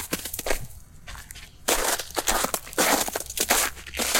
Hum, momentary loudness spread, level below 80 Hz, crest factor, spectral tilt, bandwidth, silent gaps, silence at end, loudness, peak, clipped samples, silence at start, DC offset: none; 21 LU; -42 dBFS; 24 dB; -1 dB/octave; 17 kHz; none; 0 s; -25 LUFS; -4 dBFS; under 0.1%; 0 s; under 0.1%